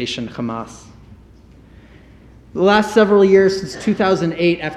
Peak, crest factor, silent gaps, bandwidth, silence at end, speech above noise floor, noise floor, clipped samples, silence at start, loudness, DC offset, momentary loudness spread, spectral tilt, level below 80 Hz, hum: 0 dBFS; 16 dB; none; 11.5 kHz; 0 s; 29 dB; -44 dBFS; under 0.1%; 0 s; -15 LUFS; under 0.1%; 15 LU; -6 dB/octave; -48 dBFS; none